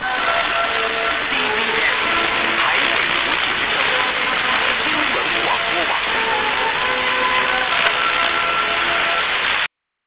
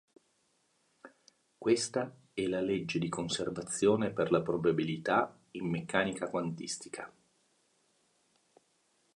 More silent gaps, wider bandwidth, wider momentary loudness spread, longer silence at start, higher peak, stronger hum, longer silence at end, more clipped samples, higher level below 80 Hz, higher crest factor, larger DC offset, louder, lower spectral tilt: neither; second, 4 kHz vs 11.5 kHz; second, 2 LU vs 10 LU; second, 0 s vs 1.05 s; first, -2 dBFS vs -12 dBFS; neither; second, 0.4 s vs 2.1 s; neither; first, -48 dBFS vs -68 dBFS; second, 16 dB vs 22 dB; first, 0.2% vs under 0.1%; first, -17 LUFS vs -33 LUFS; about the same, -5.5 dB/octave vs -5 dB/octave